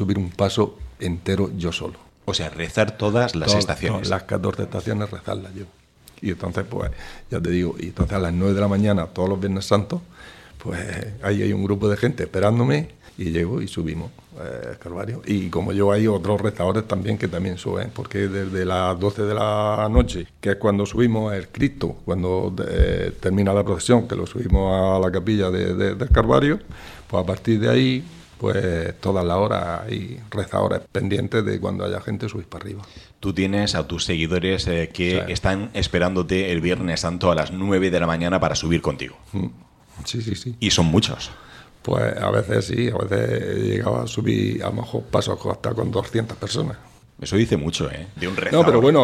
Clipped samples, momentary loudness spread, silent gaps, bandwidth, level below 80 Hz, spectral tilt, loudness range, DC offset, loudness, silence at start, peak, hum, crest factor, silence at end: under 0.1%; 11 LU; none; 13.5 kHz; -36 dBFS; -6 dB/octave; 4 LU; under 0.1%; -22 LUFS; 0 s; 0 dBFS; none; 22 dB; 0 s